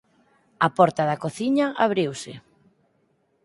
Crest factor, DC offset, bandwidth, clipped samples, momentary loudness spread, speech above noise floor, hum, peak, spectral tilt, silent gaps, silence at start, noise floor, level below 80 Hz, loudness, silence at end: 22 dB; under 0.1%; 11.5 kHz; under 0.1%; 10 LU; 45 dB; none; -2 dBFS; -6 dB/octave; none; 0.6 s; -67 dBFS; -68 dBFS; -22 LUFS; 1.05 s